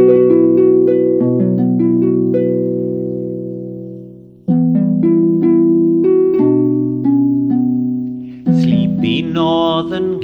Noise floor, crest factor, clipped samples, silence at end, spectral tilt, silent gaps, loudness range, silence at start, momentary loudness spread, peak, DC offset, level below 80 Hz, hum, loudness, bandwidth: -35 dBFS; 12 dB; under 0.1%; 0 s; -9.5 dB/octave; none; 4 LU; 0 s; 12 LU; 0 dBFS; under 0.1%; -52 dBFS; none; -14 LUFS; 5.2 kHz